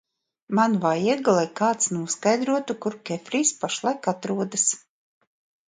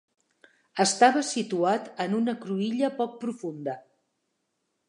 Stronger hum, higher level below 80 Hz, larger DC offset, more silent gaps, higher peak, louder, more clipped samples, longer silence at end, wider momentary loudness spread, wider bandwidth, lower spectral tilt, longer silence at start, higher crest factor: neither; first, -72 dBFS vs -84 dBFS; neither; neither; about the same, -6 dBFS vs -4 dBFS; about the same, -24 LUFS vs -26 LUFS; neither; second, 0.9 s vs 1.1 s; second, 7 LU vs 14 LU; second, 9.6 kHz vs 11 kHz; about the same, -3.5 dB/octave vs -4 dB/octave; second, 0.5 s vs 0.75 s; second, 18 dB vs 24 dB